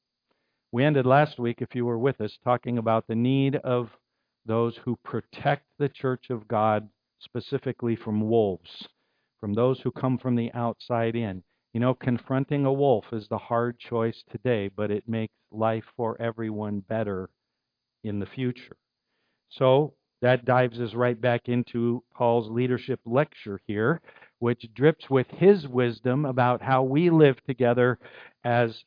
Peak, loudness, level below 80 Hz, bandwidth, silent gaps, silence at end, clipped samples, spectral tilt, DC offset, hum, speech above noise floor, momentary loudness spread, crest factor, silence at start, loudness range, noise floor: -6 dBFS; -26 LUFS; -68 dBFS; 5.2 kHz; none; 0.1 s; under 0.1%; -10.5 dB/octave; under 0.1%; none; 58 dB; 11 LU; 20 dB; 0.75 s; 6 LU; -84 dBFS